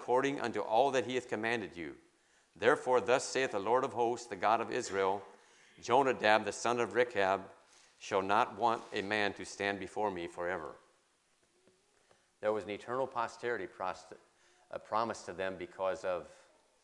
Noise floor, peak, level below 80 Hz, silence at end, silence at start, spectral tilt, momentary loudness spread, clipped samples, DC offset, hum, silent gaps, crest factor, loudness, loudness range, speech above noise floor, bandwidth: -73 dBFS; -10 dBFS; -78 dBFS; 0.5 s; 0 s; -4 dB/octave; 11 LU; under 0.1%; under 0.1%; none; none; 24 dB; -34 LUFS; 8 LU; 39 dB; 11.5 kHz